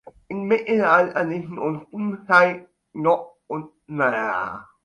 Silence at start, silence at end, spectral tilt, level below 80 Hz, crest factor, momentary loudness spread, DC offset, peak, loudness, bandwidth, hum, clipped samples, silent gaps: 0.3 s; 0.25 s; -7 dB/octave; -64 dBFS; 20 dB; 16 LU; under 0.1%; -2 dBFS; -21 LUFS; 10 kHz; none; under 0.1%; none